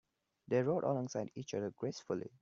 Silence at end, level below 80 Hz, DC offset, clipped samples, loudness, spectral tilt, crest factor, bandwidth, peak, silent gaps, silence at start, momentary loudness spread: 0.15 s; -80 dBFS; under 0.1%; under 0.1%; -38 LUFS; -6.5 dB/octave; 18 dB; 7.6 kHz; -22 dBFS; none; 0.5 s; 8 LU